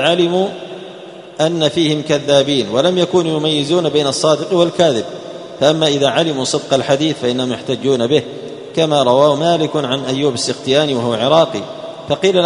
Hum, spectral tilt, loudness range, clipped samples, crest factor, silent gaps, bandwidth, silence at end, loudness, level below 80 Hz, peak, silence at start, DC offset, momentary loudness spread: none; -4.5 dB/octave; 1 LU; under 0.1%; 14 dB; none; 11 kHz; 0 s; -15 LUFS; -56 dBFS; 0 dBFS; 0 s; under 0.1%; 14 LU